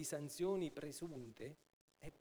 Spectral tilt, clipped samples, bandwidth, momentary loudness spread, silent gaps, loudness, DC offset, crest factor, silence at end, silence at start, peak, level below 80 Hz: -5 dB/octave; under 0.1%; over 20 kHz; 19 LU; 1.73-1.88 s; -46 LUFS; under 0.1%; 16 dB; 0 s; 0 s; -30 dBFS; -72 dBFS